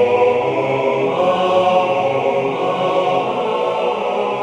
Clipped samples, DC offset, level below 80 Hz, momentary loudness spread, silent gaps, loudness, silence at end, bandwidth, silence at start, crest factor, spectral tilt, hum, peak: under 0.1%; under 0.1%; -60 dBFS; 5 LU; none; -17 LUFS; 0 s; 10 kHz; 0 s; 14 dB; -6 dB/octave; none; -4 dBFS